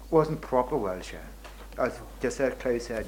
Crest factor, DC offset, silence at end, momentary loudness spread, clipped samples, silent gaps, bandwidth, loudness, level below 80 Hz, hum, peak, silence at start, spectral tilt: 20 dB; under 0.1%; 0 s; 18 LU; under 0.1%; none; 17 kHz; -29 LUFS; -46 dBFS; none; -8 dBFS; 0 s; -6 dB/octave